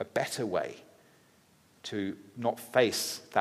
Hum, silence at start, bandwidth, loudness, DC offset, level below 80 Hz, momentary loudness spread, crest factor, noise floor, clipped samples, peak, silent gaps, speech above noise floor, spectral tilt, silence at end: none; 0 s; 15.5 kHz; -32 LUFS; under 0.1%; -78 dBFS; 13 LU; 24 dB; -64 dBFS; under 0.1%; -10 dBFS; none; 32 dB; -3.5 dB/octave; 0 s